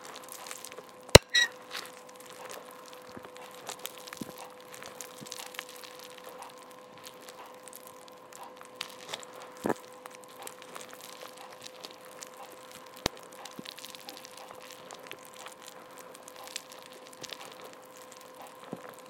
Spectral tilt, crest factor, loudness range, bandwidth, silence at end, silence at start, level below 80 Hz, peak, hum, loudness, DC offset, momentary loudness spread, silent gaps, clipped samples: -3 dB/octave; 36 dB; 18 LU; 17 kHz; 0 s; 0 s; -50 dBFS; 0 dBFS; none; -31 LUFS; under 0.1%; 12 LU; none; under 0.1%